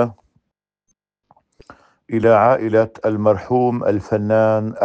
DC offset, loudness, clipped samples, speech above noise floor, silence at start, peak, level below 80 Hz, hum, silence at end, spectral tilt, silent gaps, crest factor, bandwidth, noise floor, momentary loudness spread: under 0.1%; -17 LUFS; under 0.1%; 61 dB; 0 s; -2 dBFS; -58 dBFS; none; 0 s; -9 dB/octave; none; 16 dB; 7.4 kHz; -77 dBFS; 7 LU